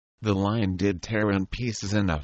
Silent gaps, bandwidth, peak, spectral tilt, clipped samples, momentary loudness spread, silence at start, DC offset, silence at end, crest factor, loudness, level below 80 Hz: none; 8.2 kHz; -10 dBFS; -6 dB/octave; under 0.1%; 4 LU; 0.2 s; under 0.1%; 0 s; 16 dB; -26 LUFS; -44 dBFS